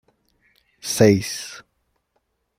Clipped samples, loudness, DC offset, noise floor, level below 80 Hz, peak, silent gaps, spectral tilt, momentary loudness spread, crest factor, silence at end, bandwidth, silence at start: under 0.1%; -19 LUFS; under 0.1%; -71 dBFS; -58 dBFS; -2 dBFS; none; -5 dB/octave; 20 LU; 22 dB; 1 s; 16 kHz; 0.85 s